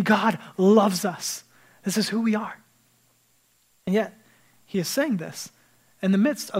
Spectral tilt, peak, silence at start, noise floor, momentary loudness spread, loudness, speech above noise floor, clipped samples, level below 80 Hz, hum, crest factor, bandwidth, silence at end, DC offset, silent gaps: -5 dB/octave; -6 dBFS; 0 s; -64 dBFS; 17 LU; -24 LUFS; 41 dB; under 0.1%; -74 dBFS; none; 20 dB; 16 kHz; 0 s; under 0.1%; none